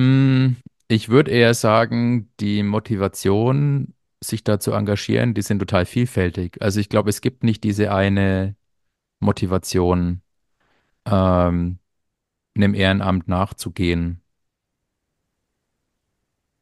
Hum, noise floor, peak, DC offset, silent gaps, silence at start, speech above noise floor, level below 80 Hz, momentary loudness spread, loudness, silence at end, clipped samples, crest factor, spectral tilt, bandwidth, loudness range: none; -78 dBFS; 0 dBFS; under 0.1%; none; 0 s; 59 dB; -44 dBFS; 9 LU; -20 LUFS; 2.45 s; under 0.1%; 20 dB; -6.5 dB/octave; 12.5 kHz; 4 LU